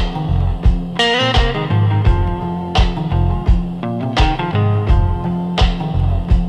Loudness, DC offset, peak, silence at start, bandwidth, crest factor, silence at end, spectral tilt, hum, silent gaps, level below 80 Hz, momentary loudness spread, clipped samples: -17 LUFS; under 0.1%; -2 dBFS; 0 s; 9.4 kHz; 12 dB; 0 s; -6.5 dB/octave; none; none; -18 dBFS; 5 LU; under 0.1%